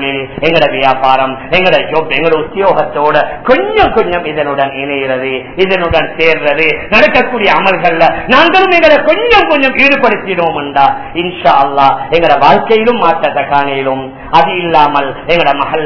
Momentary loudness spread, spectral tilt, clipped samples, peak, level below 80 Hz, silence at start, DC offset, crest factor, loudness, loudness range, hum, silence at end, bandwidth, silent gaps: 7 LU; -6 dB/octave; 3%; 0 dBFS; -36 dBFS; 0 s; 5%; 10 dB; -9 LUFS; 4 LU; none; 0 s; 5.4 kHz; none